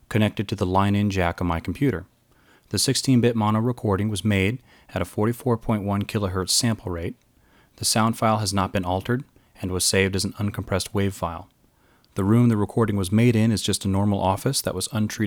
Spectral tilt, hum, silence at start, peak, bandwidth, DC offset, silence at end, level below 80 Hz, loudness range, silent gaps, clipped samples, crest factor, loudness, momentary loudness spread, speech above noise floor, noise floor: -5 dB/octave; none; 0.1 s; -4 dBFS; 19.5 kHz; under 0.1%; 0 s; -48 dBFS; 3 LU; none; under 0.1%; 20 dB; -23 LUFS; 10 LU; 37 dB; -60 dBFS